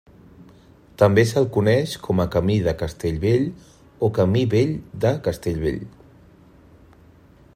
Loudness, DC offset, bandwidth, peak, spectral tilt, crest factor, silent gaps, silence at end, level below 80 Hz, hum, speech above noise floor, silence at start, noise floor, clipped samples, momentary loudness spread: -21 LUFS; under 0.1%; 15.5 kHz; -2 dBFS; -7 dB/octave; 20 dB; none; 1.65 s; -44 dBFS; none; 30 dB; 1 s; -50 dBFS; under 0.1%; 8 LU